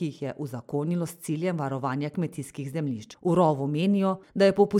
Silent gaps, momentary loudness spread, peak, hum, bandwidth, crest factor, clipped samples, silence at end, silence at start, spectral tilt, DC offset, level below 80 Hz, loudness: none; 11 LU; -8 dBFS; none; 15.5 kHz; 18 dB; under 0.1%; 0 s; 0 s; -7 dB/octave; under 0.1%; -66 dBFS; -27 LUFS